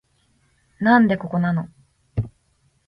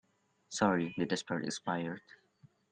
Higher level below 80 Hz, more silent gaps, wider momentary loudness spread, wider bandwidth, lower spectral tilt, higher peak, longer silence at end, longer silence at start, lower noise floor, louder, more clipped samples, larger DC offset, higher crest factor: first, -48 dBFS vs -74 dBFS; neither; first, 17 LU vs 12 LU; second, 5.2 kHz vs 9.8 kHz; first, -9 dB/octave vs -4.5 dB/octave; first, -4 dBFS vs -14 dBFS; about the same, 0.6 s vs 0.6 s; first, 0.8 s vs 0.5 s; about the same, -64 dBFS vs -66 dBFS; first, -20 LUFS vs -35 LUFS; neither; neither; about the same, 20 dB vs 22 dB